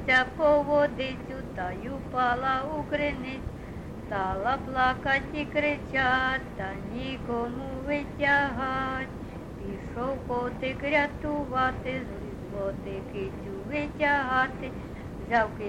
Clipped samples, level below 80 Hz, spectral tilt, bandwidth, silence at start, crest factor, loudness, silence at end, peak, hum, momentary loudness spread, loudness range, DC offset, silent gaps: under 0.1%; -44 dBFS; -6.5 dB/octave; 12 kHz; 0 s; 20 dB; -29 LUFS; 0 s; -10 dBFS; none; 14 LU; 3 LU; under 0.1%; none